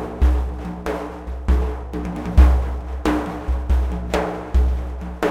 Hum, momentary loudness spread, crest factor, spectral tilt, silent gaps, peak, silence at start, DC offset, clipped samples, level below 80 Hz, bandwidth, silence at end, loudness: none; 12 LU; 18 dB; -7.5 dB/octave; none; 0 dBFS; 0 s; under 0.1%; under 0.1%; -20 dBFS; 8.8 kHz; 0 s; -22 LUFS